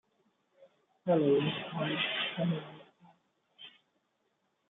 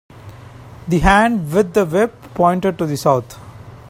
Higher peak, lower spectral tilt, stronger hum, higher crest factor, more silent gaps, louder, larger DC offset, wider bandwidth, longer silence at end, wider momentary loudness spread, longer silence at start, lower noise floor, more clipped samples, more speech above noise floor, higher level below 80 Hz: second, -18 dBFS vs 0 dBFS; second, -4 dB/octave vs -6 dB/octave; neither; about the same, 18 dB vs 18 dB; neither; second, -32 LUFS vs -16 LUFS; neither; second, 4.1 kHz vs 16.5 kHz; first, 1 s vs 0 s; first, 25 LU vs 11 LU; first, 0.6 s vs 0.15 s; first, -78 dBFS vs -37 dBFS; neither; first, 47 dB vs 22 dB; second, -80 dBFS vs -34 dBFS